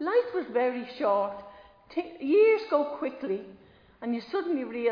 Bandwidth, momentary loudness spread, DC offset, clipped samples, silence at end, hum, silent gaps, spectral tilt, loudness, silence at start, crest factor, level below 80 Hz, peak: 5.2 kHz; 13 LU; under 0.1%; under 0.1%; 0 s; none; none; -7 dB/octave; -28 LUFS; 0 s; 18 dB; -70 dBFS; -10 dBFS